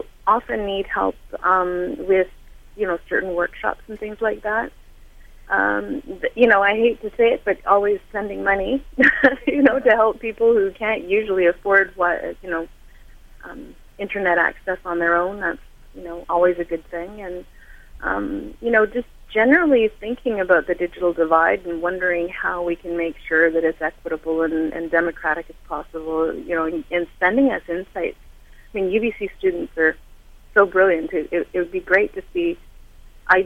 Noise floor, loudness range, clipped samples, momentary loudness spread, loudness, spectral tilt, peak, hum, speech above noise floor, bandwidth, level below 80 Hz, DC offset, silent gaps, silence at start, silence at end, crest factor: -44 dBFS; 6 LU; under 0.1%; 13 LU; -20 LUFS; -6.5 dB/octave; 0 dBFS; none; 24 dB; 13 kHz; -44 dBFS; under 0.1%; none; 0 s; 0 s; 20 dB